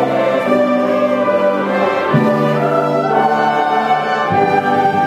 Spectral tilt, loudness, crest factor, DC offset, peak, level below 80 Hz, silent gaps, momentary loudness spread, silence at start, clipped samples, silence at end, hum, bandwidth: -7 dB/octave; -14 LUFS; 12 dB; under 0.1%; 0 dBFS; -58 dBFS; none; 2 LU; 0 s; under 0.1%; 0 s; none; 15 kHz